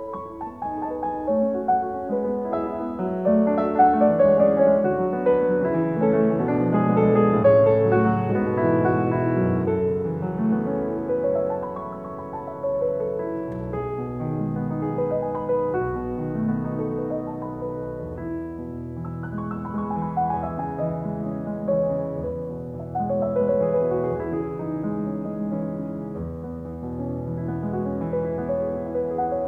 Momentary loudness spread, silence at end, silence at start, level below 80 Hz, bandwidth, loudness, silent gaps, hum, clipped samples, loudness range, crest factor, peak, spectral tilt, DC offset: 13 LU; 0 s; 0 s; -50 dBFS; 4.1 kHz; -24 LUFS; none; none; under 0.1%; 10 LU; 18 dB; -6 dBFS; -11 dB/octave; 0.1%